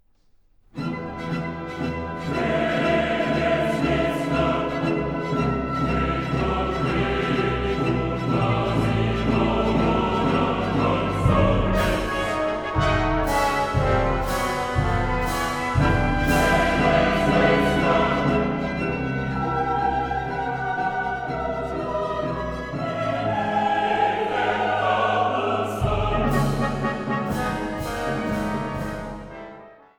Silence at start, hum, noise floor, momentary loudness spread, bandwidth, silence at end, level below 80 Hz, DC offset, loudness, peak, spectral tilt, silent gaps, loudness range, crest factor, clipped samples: 0.75 s; none; -58 dBFS; 8 LU; 19.5 kHz; 0.25 s; -34 dBFS; under 0.1%; -23 LUFS; -6 dBFS; -6.5 dB/octave; none; 5 LU; 16 dB; under 0.1%